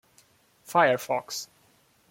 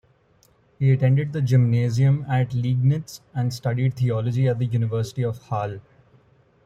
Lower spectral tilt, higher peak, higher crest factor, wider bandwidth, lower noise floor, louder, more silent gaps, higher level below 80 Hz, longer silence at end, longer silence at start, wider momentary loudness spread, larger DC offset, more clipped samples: second, -3.5 dB/octave vs -8 dB/octave; about the same, -8 dBFS vs -8 dBFS; first, 22 dB vs 14 dB; first, 16.5 kHz vs 8.4 kHz; about the same, -63 dBFS vs -60 dBFS; second, -26 LUFS vs -22 LUFS; neither; second, -76 dBFS vs -56 dBFS; second, 0.65 s vs 0.85 s; about the same, 0.7 s vs 0.8 s; first, 14 LU vs 9 LU; neither; neither